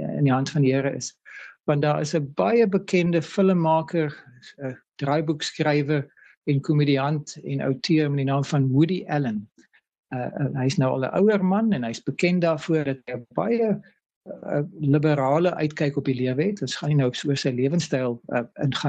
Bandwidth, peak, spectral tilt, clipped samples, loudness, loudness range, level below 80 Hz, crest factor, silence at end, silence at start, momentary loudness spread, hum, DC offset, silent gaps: 8.8 kHz; -8 dBFS; -6.5 dB/octave; under 0.1%; -23 LUFS; 2 LU; -64 dBFS; 16 dB; 0 s; 0 s; 11 LU; none; under 0.1%; 6.37-6.42 s, 9.99-10.03 s, 14.06-14.10 s, 14.16-14.21 s